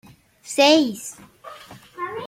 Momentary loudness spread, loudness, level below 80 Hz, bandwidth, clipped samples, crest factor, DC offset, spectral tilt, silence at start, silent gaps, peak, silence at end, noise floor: 26 LU; -18 LUFS; -66 dBFS; 16 kHz; under 0.1%; 20 dB; under 0.1%; -2.5 dB/octave; 0.45 s; none; -4 dBFS; 0 s; -43 dBFS